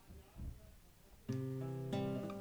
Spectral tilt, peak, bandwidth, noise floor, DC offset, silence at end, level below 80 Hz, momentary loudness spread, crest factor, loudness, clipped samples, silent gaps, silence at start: -7.5 dB/octave; -28 dBFS; over 20 kHz; -62 dBFS; under 0.1%; 0 s; -58 dBFS; 22 LU; 16 dB; -44 LUFS; under 0.1%; none; 0 s